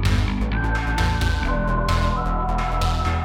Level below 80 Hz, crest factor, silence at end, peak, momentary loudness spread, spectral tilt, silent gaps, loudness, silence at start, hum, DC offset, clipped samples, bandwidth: -24 dBFS; 12 dB; 0 s; -8 dBFS; 2 LU; -6 dB/octave; none; -22 LUFS; 0 s; none; under 0.1%; under 0.1%; 14.5 kHz